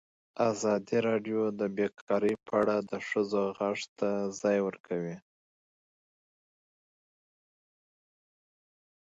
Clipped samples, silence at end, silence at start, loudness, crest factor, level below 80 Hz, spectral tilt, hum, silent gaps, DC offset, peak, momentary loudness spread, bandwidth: under 0.1%; 3.9 s; 0.35 s; -31 LUFS; 20 dB; -74 dBFS; -5.5 dB/octave; none; 2.01-2.07 s, 3.89-3.96 s, 4.80-4.84 s; under 0.1%; -14 dBFS; 7 LU; 8 kHz